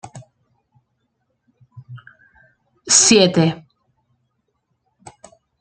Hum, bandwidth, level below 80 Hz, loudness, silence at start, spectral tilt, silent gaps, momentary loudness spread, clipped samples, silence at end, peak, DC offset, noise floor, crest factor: none; 10 kHz; -60 dBFS; -13 LUFS; 0.05 s; -3 dB/octave; none; 25 LU; under 0.1%; 2.05 s; 0 dBFS; under 0.1%; -71 dBFS; 22 dB